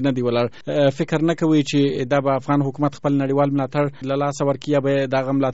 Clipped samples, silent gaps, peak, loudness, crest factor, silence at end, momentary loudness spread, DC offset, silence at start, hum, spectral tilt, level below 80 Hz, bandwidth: under 0.1%; none; -4 dBFS; -20 LUFS; 16 dB; 0 s; 5 LU; 0.7%; 0 s; none; -6 dB/octave; -58 dBFS; 8 kHz